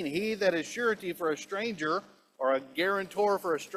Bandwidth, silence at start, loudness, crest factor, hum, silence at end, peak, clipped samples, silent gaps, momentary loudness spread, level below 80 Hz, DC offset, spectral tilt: 15.5 kHz; 0 s; -30 LUFS; 16 dB; none; 0 s; -14 dBFS; under 0.1%; none; 5 LU; -72 dBFS; under 0.1%; -4 dB/octave